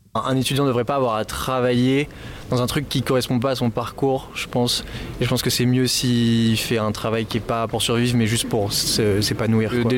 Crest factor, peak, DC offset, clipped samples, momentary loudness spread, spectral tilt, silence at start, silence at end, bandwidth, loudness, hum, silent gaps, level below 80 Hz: 10 dB; -10 dBFS; under 0.1%; under 0.1%; 5 LU; -5 dB/octave; 0.15 s; 0 s; 17 kHz; -21 LUFS; none; none; -42 dBFS